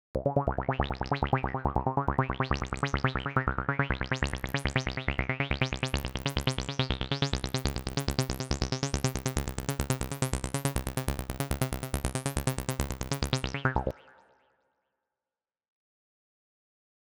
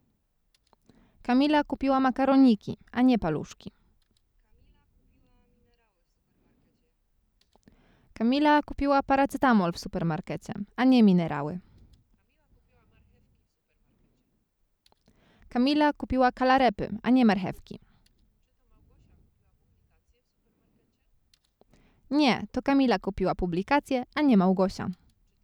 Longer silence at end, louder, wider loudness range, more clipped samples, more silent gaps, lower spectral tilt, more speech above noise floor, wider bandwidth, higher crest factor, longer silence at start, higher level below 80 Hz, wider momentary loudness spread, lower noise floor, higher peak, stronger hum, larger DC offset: first, 2.95 s vs 0.5 s; second, -31 LUFS vs -25 LUFS; second, 4 LU vs 8 LU; neither; neither; second, -4.5 dB/octave vs -7 dB/octave; first, over 61 dB vs 49 dB; first, over 20 kHz vs 11.5 kHz; first, 24 dB vs 16 dB; second, 0.15 s vs 1.3 s; first, -40 dBFS vs -52 dBFS; second, 4 LU vs 14 LU; first, under -90 dBFS vs -73 dBFS; about the same, -8 dBFS vs -10 dBFS; neither; neither